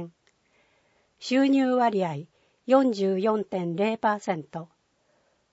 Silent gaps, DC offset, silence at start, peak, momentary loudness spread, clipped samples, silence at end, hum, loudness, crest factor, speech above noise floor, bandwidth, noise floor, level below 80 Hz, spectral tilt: none; under 0.1%; 0 s; -8 dBFS; 18 LU; under 0.1%; 0.9 s; none; -25 LUFS; 20 dB; 44 dB; 8 kHz; -69 dBFS; -76 dBFS; -6.5 dB/octave